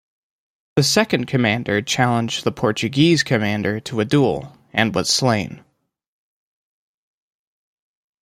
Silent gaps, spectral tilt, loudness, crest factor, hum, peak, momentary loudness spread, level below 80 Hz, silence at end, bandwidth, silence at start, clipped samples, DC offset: none; -4.5 dB/octave; -19 LUFS; 20 dB; none; -2 dBFS; 7 LU; -56 dBFS; 2.65 s; 16 kHz; 0.75 s; under 0.1%; under 0.1%